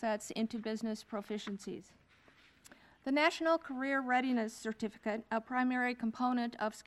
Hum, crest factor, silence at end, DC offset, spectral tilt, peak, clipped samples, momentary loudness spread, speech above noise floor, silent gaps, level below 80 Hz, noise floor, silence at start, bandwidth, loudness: none; 20 dB; 0.05 s; under 0.1%; -4.5 dB/octave; -16 dBFS; under 0.1%; 11 LU; 29 dB; none; -74 dBFS; -65 dBFS; 0 s; 13 kHz; -36 LUFS